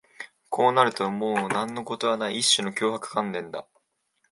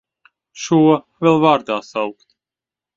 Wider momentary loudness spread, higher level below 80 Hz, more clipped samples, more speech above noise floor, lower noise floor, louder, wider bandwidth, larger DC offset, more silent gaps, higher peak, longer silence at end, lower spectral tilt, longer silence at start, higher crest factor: first, 15 LU vs 12 LU; second, -74 dBFS vs -62 dBFS; neither; second, 47 dB vs 73 dB; second, -72 dBFS vs -89 dBFS; second, -25 LUFS vs -16 LUFS; first, 11.5 kHz vs 7.6 kHz; neither; neither; second, -4 dBFS vs 0 dBFS; second, 0.7 s vs 0.85 s; second, -2.5 dB/octave vs -6 dB/octave; second, 0.2 s vs 0.55 s; about the same, 22 dB vs 18 dB